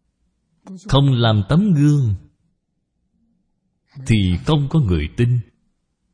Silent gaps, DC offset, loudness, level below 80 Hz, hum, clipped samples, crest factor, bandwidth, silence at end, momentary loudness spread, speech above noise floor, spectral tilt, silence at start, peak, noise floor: none; under 0.1%; -17 LUFS; -36 dBFS; none; under 0.1%; 18 dB; 10.5 kHz; 0.7 s; 8 LU; 55 dB; -7.5 dB/octave; 0.65 s; 0 dBFS; -71 dBFS